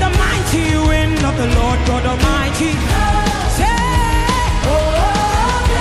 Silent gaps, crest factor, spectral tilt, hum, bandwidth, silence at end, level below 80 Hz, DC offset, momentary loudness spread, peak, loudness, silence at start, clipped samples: none; 12 dB; -5 dB/octave; none; 14.5 kHz; 0 s; -18 dBFS; under 0.1%; 2 LU; -2 dBFS; -15 LUFS; 0 s; under 0.1%